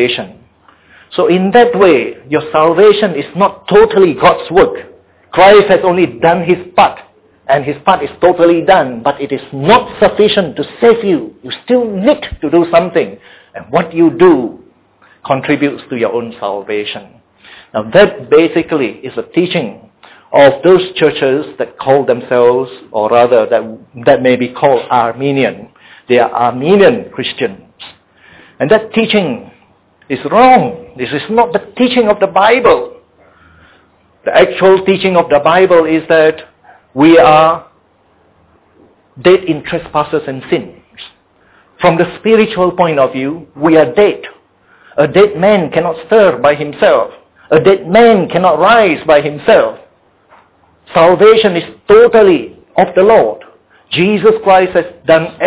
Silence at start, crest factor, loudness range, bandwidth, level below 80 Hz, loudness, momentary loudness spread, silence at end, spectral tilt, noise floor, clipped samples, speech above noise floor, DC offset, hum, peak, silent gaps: 0 s; 10 dB; 5 LU; 4 kHz; -44 dBFS; -10 LUFS; 12 LU; 0 s; -10 dB/octave; -51 dBFS; 0.5%; 41 dB; under 0.1%; none; 0 dBFS; none